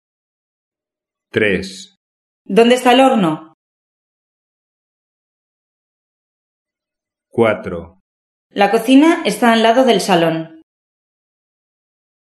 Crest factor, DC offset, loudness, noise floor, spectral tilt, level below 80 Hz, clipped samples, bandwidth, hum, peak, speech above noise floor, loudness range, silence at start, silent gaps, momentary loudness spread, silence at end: 18 dB; under 0.1%; -13 LUFS; -87 dBFS; -5 dB/octave; -56 dBFS; under 0.1%; 13 kHz; none; 0 dBFS; 74 dB; 10 LU; 1.35 s; 1.97-2.45 s, 3.54-6.65 s, 8.00-8.50 s; 17 LU; 1.75 s